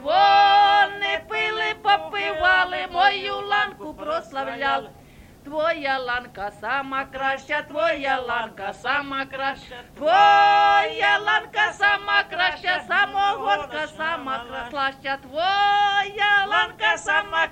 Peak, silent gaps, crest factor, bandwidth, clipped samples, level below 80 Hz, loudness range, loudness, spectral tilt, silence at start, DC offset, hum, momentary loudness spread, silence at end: -4 dBFS; none; 18 dB; 9.6 kHz; under 0.1%; -54 dBFS; 7 LU; -21 LUFS; -2.5 dB/octave; 0 s; under 0.1%; none; 13 LU; 0 s